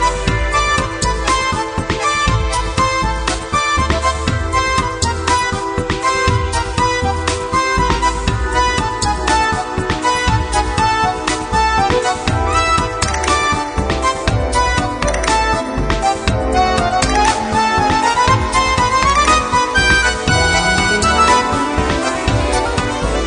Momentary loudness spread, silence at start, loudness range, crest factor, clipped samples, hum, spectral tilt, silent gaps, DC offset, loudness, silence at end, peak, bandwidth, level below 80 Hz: 5 LU; 0 s; 4 LU; 16 dB; under 0.1%; none; -4 dB/octave; none; under 0.1%; -15 LUFS; 0 s; 0 dBFS; 10.5 kHz; -24 dBFS